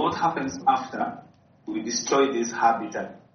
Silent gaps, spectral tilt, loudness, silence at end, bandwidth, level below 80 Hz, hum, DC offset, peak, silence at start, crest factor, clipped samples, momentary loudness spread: none; -3 dB/octave; -25 LUFS; 0.15 s; 6.6 kHz; -66 dBFS; none; under 0.1%; -8 dBFS; 0 s; 18 dB; under 0.1%; 12 LU